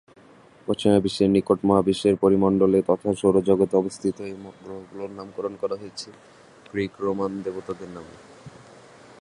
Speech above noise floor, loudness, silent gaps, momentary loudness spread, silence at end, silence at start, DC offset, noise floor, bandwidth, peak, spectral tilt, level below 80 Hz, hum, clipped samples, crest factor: 29 dB; -22 LUFS; none; 18 LU; 0.7 s; 0.7 s; under 0.1%; -51 dBFS; 11.5 kHz; -4 dBFS; -7 dB/octave; -54 dBFS; none; under 0.1%; 20 dB